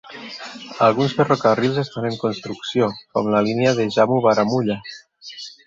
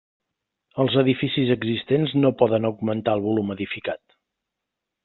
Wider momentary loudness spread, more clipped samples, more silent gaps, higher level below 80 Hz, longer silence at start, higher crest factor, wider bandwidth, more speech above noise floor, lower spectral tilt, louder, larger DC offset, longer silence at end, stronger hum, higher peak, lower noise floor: first, 17 LU vs 10 LU; neither; neither; about the same, -60 dBFS vs -60 dBFS; second, 0.05 s vs 0.75 s; about the same, 18 dB vs 20 dB; first, 7.8 kHz vs 4.3 kHz; second, 19 dB vs 62 dB; about the same, -6 dB/octave vs -5.5 dB/octave; first, -19 LUFS vs -22 LUFS; neither; second, 0.2 s vs 1.1 s; neither; about the same, -2 dBFS vs -4 dBFS; second, -38 dBFS vs -83 dBFS